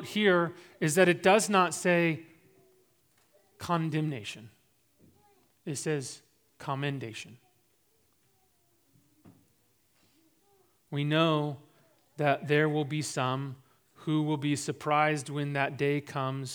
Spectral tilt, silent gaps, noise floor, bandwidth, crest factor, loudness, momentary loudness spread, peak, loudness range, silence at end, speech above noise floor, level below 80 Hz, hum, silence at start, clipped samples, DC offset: -5 dB/octave; none; -71 dBFS; over 20 kHz; 24 dB; -29 LUFS; 18 LU; -8 dBFS; 13 LU; 0 s; 42 dB; -78 dBFS; none; 0 s; under 0.1%; under 0.1%